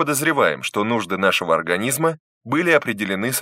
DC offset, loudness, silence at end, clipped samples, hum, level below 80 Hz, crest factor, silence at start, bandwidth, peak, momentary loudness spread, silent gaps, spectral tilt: under 0.1%; -19 LUFS; 0 s; under 0.1%; none; -64 dBFS; 20 dB; 0 s; 16 kHz; 0 dBFS; 6 LU; 2.20-2.41 s; -3.5 dB/octave